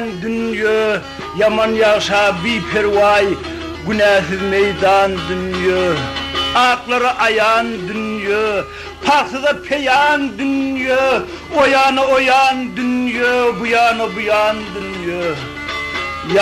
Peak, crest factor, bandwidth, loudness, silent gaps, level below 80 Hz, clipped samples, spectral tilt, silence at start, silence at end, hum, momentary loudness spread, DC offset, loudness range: -4 dBFS; 12 dB; 13.5 kHz; -15 LUFS; none; -44 dBFS; under 0.1%; -4.5 dB/octave; 0 s; 0 s; none; 9 LU; under 0.1%; 2 LU